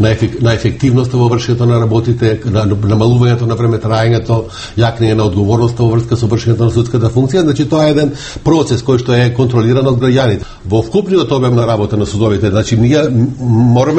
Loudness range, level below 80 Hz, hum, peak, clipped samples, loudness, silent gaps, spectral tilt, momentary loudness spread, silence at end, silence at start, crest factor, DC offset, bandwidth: 1 LU; -34 dBFS; none; 0 dBFS; under 0.1%; -12 LUFS; none; -7 dB/octave; 3 LU; 0 s; 0 s; 10 dB; under 0.1%; 8.6 kHz